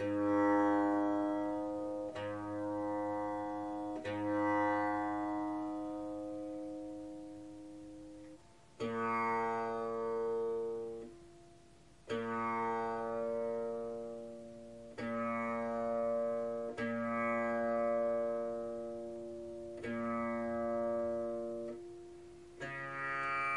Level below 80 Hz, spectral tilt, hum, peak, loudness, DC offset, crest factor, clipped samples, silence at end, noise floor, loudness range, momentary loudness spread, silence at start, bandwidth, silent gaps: -70 dBFS; -7 dB/octave; none; -22 dBFS; -37 LUFS; under 0.1%; 16 dB; under 0.1%; 0 s; -62 dBFS; 4 LU; 16 LU; 0 s; 11 kHz; none